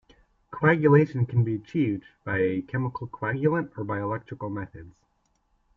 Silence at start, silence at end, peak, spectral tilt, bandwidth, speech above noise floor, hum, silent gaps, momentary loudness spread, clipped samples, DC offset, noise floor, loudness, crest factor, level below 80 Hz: 0.5 s; 0.85 s; -6 dBFS; -10 dB/octave; 6 kHz; 45 dB; none; none; 14 LU; under 0.1%; under 0.1%; -70 dBFS; -26 LUFS; 20 dB; -60 dBFS